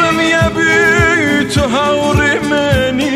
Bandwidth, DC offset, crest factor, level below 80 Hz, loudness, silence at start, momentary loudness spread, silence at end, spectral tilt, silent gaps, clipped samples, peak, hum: 16 kHz; under 0.1%; 12 dB; -30 dBFS; -11 LUFS; 0 s; 4 LU; 0 s; -5 dB/octave; none; under 0.1%; 0 dBFS; none